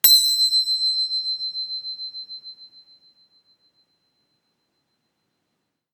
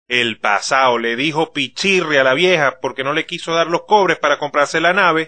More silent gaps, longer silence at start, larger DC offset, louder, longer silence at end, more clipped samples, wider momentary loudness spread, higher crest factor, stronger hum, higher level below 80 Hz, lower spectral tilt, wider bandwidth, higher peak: neither; about the same, 0.05 s vs 0.1 s; second, under 0.1% vs 0.3%; second, -19 LUFS vs -15 LUFS; first, 3.25 s vs 0 s; neither; first, 21 LU vs 6 LU; first, 26 dB vs 16 dB; neither; second, -88 dBFS vs -64 dBFS; second, 4.5 dB/octave vs -3.5 dB/octave; first, 19 kHz vs 9.4 kHz; about the same, 0 dBFS vs 0 dBFS